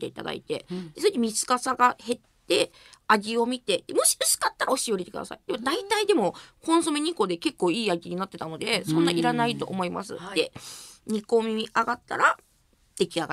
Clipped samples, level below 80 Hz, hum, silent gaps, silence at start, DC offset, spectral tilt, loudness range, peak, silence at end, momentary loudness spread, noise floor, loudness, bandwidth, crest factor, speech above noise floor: under 0.1%; -66 dBFS; none; none; 0 s; under 0.1%; -3 dB/octave; 3 LU; -4 dBFS; 0 s; 11 LU; -64 dBFS; -26 LUFS; 16 kHz; 22 dB; 38 dB